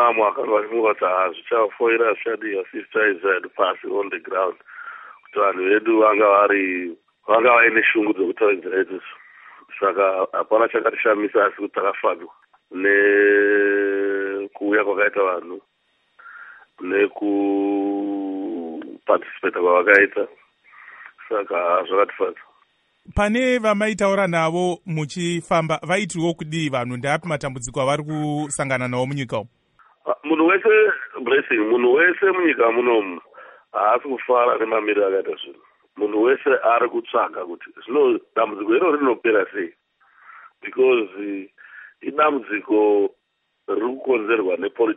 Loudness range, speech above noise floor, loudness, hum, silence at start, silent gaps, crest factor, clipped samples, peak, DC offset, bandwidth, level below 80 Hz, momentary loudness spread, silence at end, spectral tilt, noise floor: 6 LU; 52 dB; -20 LUFS; none; 0 s; none; 20 dB; under 0.1%; 0 dBFS; under 0.1%; 11 kHz; -52 dBFS; 14 LU; 0 s; -5.5 dB/octave; -72 dBFS